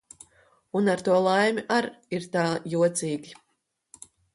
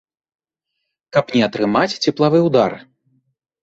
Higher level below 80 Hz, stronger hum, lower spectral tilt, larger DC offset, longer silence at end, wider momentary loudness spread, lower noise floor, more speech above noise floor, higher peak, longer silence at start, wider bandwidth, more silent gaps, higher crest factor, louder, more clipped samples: second, -70 dBFS vs -58 dBFS; neither; about the same, -5 dB/octave vs -6 dB/octave; neither; first, 1 s vs 0.85 s; first, 10 LU vs 6 LU; about the same, -76 dBFS vs -77 dBFS; second, 51 dB vs 61 dB; second, -10 dBFS vs -2 dBFS; second, 0.75 s vs 1.15 s; first, 11.5 kHz vs 8 kHz; neither; about the same, 18 dB vs 18 dB; second, -25 LUFS vs -17 LUFS; neither